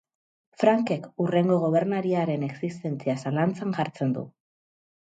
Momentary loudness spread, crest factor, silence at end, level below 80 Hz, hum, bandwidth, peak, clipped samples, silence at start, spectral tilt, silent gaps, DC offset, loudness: 9 LU; 20 dB; 0.75 s; -72 dBFS; none; 9 kHz; -6 dBFS; under 0.1%; 0.6 s; -8 dB/octave; none; under 0.1%; -26 LUFS